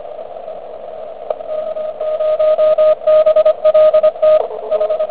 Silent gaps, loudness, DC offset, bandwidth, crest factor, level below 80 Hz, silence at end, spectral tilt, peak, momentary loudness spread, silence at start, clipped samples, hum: none; -13 LUFS; 1%; 4 kHz; 12 dB; -56 dBFS; 0 s; -7 dB/octave; -2 dBFS; 19 LU; 0 s; under 0.1%; none